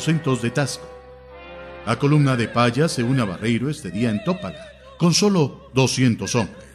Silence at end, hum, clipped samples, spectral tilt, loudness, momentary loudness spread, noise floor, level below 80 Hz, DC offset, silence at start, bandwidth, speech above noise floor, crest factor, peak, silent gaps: 0.1 s; none; under 0.1%; -5.5 dB/octave; -21 LUFS; 16 LU; -41 dBFS; -50 dBFS; under 0.1%; 0 s; 13.5 kHz; 21 dB; 16 dB; -6 dBFS; none